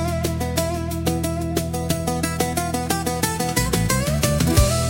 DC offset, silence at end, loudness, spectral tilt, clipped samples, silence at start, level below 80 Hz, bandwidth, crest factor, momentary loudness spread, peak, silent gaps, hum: under 0.1%; 0 s; -22 LUFS; -4.5 dB/octave; under 0.1%; 0 s; -30 dBFS; 17 kHz; 18 dB; 6 LU; -2 dBFS; none; none